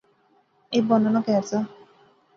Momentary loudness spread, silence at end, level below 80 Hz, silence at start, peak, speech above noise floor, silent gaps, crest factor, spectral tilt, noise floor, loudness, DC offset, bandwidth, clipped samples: 8 LU; 0.7 s; -70 dBFS; 0.7 s; -6 dBFS; 42 dB; none; 20 dB; -6.5 dB/octave; -63 dBFS; -23 LUFS; under 0.1%; 7.4 kHz; under 0.1%